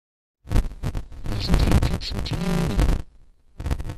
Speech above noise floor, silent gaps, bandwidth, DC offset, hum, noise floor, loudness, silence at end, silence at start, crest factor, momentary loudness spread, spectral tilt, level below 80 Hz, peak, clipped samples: 30 dB; none; 14 kHz; under 0.1%; none; -51 dBFS; -25 LUFS; 0 s; 0.45 s; 18 dB; 11 LU; -6 dB/octave; -26 dBFS; -6 dBFS; under 0.1%